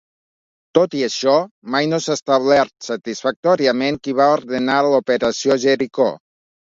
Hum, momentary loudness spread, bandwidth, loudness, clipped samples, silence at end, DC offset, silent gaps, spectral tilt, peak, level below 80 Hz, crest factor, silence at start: none; 6 LU; 7.8 kHz; -18 LUFS; under 0.1%; 0.6 s; under 0.1%; 1.51-1.62 s, 2.22-2.26 s, 3.36-3.43 s; -4.5 dB/octave; 0 dBFS; -60 dBFS; 18 dB; 0.75 s